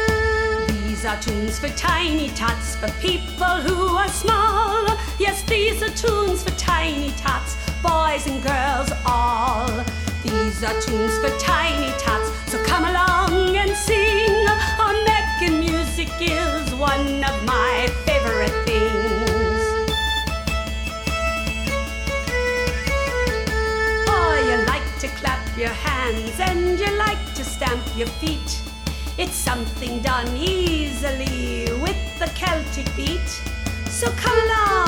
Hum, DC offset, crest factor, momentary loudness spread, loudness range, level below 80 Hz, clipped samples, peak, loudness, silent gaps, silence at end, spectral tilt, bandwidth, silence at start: none; under 0.1%; 18 dB; 7 LU; 5 LU; -28 dBFS; under 0.1%; -4 dBFS; -21 LUFS; none; 0 s; -4 dB/octave; over 20 kHz; 0 s